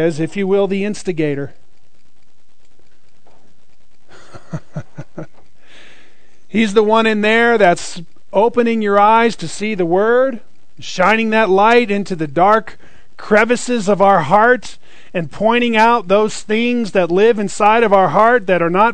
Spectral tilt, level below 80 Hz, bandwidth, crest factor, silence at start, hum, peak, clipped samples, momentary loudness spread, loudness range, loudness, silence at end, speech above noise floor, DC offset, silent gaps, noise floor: -5 dB/octave; -52 dBFS; 9.4 kHz; 16 dB; 0 s; none; 0 dBFS; under 0.1%; 18 LU; 16 LU; -14 LUFS; 0 s; 46 dB; 4%; none; -60 dBFS